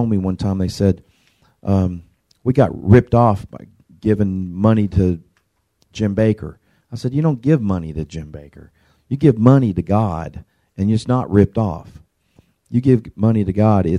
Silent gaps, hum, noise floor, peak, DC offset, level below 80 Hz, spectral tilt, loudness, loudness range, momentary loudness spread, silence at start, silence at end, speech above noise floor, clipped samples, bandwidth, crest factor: none; none; -65 dBFS; 0 dBFS; under 0.1%; -40 dBFS; -9 dB/octave; -17 LUFS; 4 LU; 17 LU; 0 s; 0 s; 49 dB; under 0.1%; 10.5 kHz; 18 dB